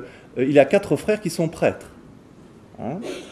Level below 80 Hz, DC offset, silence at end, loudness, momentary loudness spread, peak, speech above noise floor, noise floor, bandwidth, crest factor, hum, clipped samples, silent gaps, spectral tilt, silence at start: -56 dBFS; under 0.1%; 0 s; -21 LUFS; 17 LU; 0 dBFS; 26 dB; -47 dBFS; 13.5 kHz; 22 dB; none; under 0.1%; none; -6 dB/octave; 0 s